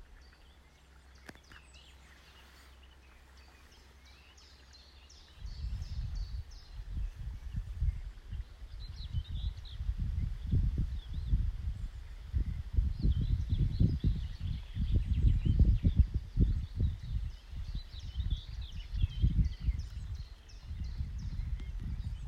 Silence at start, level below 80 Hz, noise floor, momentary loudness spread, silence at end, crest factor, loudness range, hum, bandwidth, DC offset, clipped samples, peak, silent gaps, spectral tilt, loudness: 0 s; -36 dBFS; -59 dBFS; 25 LU; 0 s; 20 dB; 24 LU; none; 7 kHz; under 0.1%; under 0.1%; -14 dBFS; none; -7.5 dB/octave; -36 LUFS